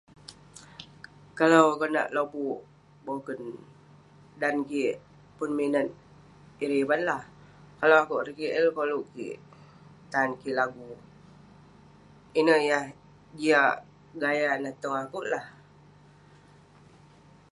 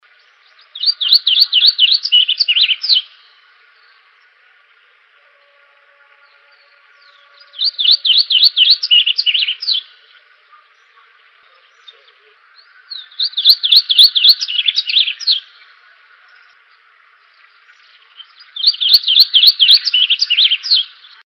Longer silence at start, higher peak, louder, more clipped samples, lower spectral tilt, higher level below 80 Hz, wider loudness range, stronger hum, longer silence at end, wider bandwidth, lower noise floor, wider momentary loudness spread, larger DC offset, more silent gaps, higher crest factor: second, 0.3 s vs 0.75 s; second, -6 dBFS vs 0 dBFS; second, -27 LUFS vs -9 LUFS; neither; first, -5 dB/octave vs 7 dB/octave; first, -68 dBFS vs -88 dBFS; second, 6 LU vs 11 LU; first, 50 Hz at -65 dBFS vs none; first, 2 s vs 0.4 s; second, 11.5 kHz vs over 20 kHz; first, -56 dBFS vs -51 dBFS; first, 24 LU vs 10 LU; neither; neither; first, 24 dB vs 16 dB